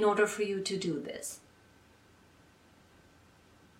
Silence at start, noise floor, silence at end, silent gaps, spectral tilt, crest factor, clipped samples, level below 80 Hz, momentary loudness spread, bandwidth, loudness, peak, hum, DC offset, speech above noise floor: 0 s; -62 dBFS; 2.4 s; none; -4 dB/octave; 20 dB; under 0.1%; -72 dBFS; 13 LU; 16 kHz; -33 LUFS; -16 dBFS; none; under 0.1%; 30 dB